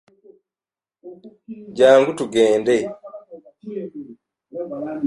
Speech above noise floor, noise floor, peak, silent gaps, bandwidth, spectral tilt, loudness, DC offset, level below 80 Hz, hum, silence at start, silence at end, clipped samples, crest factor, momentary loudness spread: over 72 dB; under -90 dBFS; -2 dBFS; none; 11.5 kHz; -5 dB/octave; -18 LUFS; under 0.1%; -64 dBFS; none; 1.05 s; 0 s; under 0.1%; 20 dB; 26 LU